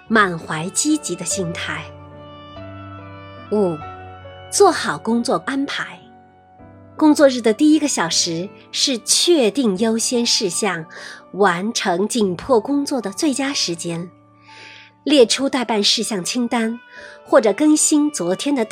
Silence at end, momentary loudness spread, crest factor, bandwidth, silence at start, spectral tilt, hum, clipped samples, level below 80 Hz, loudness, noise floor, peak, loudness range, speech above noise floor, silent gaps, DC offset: 0 s; 21 LU; 18 dB; 16 kHz; 0.1 s; -3 dB/octave; none; under 0.1%; -58 dBFS; -18 LUFS; -47 dBFS; 0 dBFS; 6 LU; 29 dB; none; under 0.1%